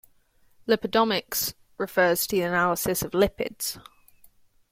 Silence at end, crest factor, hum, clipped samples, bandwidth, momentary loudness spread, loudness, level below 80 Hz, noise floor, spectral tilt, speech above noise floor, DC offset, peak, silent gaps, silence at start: 0.9 s; 20 dB; none; under 0.1%; 16.5 kHz; 10 LU; -25 LUFS; -52 dBFS; -61 dBFS; -3.5 dB/octave; 36 dB; under 0.1%; -8 dBFS; none; 0.65 s